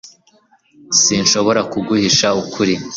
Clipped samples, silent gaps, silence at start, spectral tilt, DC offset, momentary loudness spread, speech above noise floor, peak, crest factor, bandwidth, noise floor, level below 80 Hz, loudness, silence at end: under 0.1%; none; 0.05 s; -2.5 dB/octave; under 0.1%; 6 LU; 39 dB; 0 dBFS; 16 dB; 7.8 kHz; -54 dBFS; -52 dBFS; -14 LUFS; 0 s